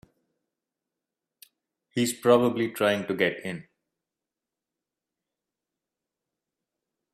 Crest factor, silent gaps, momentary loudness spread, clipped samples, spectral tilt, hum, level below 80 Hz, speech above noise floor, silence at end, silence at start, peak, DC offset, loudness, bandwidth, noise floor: 24 dB; none; 15 LU; under 0.1%; -4.5 dB/octave; none; -72 dBFS; 64 dB; 3.5 s; 1.95 s; -6 dBFS; under 0.1%; -25 LUFS; 15.5 kHz; -89 dBFS